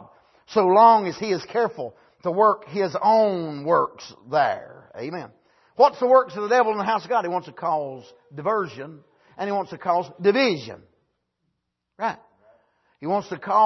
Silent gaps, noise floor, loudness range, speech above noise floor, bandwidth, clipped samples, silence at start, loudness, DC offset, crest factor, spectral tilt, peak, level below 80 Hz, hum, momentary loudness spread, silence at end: none; -77 dBFS; 6 LU; 56 dB; 6.2 kHz; under 0.1%; 0.5 s; -22 LUFS; under 0.1%; 20 dB; -6 dB/octave; -4 dBFS; -72 dBFS; none; 17 LU; 0 s